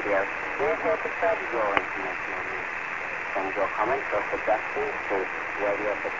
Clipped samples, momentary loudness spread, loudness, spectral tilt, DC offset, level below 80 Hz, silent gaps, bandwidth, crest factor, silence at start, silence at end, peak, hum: under 0.1%; 5 LU; -27 LUFS; -4.5 dB/octave; 0.3%; -58 dBFS; none; 7.6 kHz; 26 dB; 0 s; 0 s; -2 dBFS; none